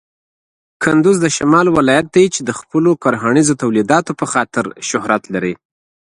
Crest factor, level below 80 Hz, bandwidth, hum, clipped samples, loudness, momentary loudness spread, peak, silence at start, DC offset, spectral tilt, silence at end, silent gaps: 14 dB; -52 dBFS; 11.5 kHz; none; under 0.1%; -14 LUFS; 8 LU; 0 dBFS; 0.8 s; under 0.1%; -5 dB/octave; 0.6 s; none